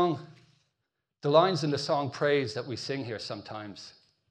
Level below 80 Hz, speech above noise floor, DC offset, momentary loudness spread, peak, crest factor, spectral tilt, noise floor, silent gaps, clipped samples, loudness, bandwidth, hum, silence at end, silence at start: -74 dBFS; 55 dB; under 0.1%; 18 LU; -10 dBFS; 20 dB; -5.5 dB/octave; -83 dBFS; none; under 0.1%; -29 LUFS; 10.5 kHz; none; 0.4 s; 0 s